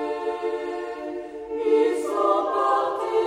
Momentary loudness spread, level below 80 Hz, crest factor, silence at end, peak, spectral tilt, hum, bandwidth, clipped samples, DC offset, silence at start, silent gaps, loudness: 12 LU; -62 dBFS; 16 dB; 0 s; -8 dBFS; -4 dB/octave; none; 12 kHz; under 0.1%; under 0.1%; 0 s; none; -24 LUFS